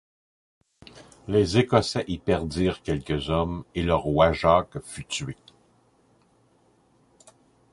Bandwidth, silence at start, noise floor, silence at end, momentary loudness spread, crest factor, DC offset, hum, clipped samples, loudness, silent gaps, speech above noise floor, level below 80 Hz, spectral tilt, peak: 11.5 kHz; 0.95 s; -63 dBFS; 2.4 s; 14 LU; 22 dB; under 0.1%; none; under 0.1%; -24 LUFS; none; 39 dB; -42 dBFS; -6 dB/octave; -4 dBFS